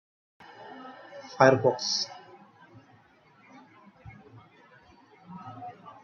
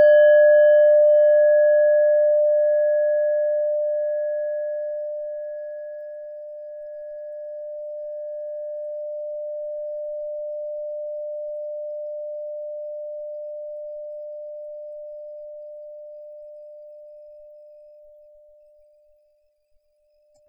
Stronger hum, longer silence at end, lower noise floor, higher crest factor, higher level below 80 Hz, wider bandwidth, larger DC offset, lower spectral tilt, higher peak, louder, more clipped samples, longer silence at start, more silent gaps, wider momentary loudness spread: neither; second, 0.15 s vs 2.8 s; second, -60 dBFS vs -65 dBFS; first, 28 dB vs 14 dB; about the same, -72 dBFS vs -74 dBFS; first, 7.4 kHz vs 3.2 kHz; neither; first, -4 dB/octave vs -2.5 dB/octave; first, -4 dBFS vs -8 dBFS; second, -24 LUFS vs -21 LUFS; neither; first, 0.6 s vs 0 s; neither; first, 28 LU vs 23 LU